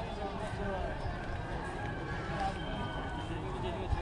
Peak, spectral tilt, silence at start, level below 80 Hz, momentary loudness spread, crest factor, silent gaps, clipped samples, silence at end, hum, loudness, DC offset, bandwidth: -18 dBFS; -6.5 dB/octave; 0 s; -44 dBFS; 3 LU; 18 dB; none; under 0.1%; 0 s; none; -38 LUFS; under 0.1%; 11 kHz